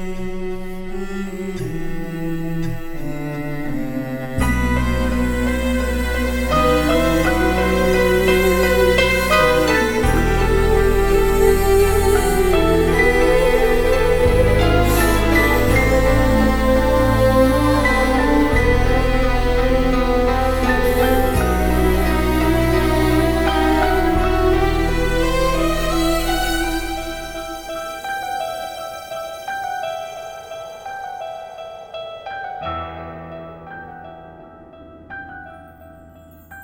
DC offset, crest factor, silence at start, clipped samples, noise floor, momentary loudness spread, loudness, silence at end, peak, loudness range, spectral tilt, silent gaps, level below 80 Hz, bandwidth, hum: under 0.1%; 16 dB; 0 s; under 0.1%; -43 dBFS; 15 LU; -18 LUFS; 0 s; -2 dBFS; 15 LU; -5.5 dB/octave; none; -24 dBFS; 19.5 kHz; none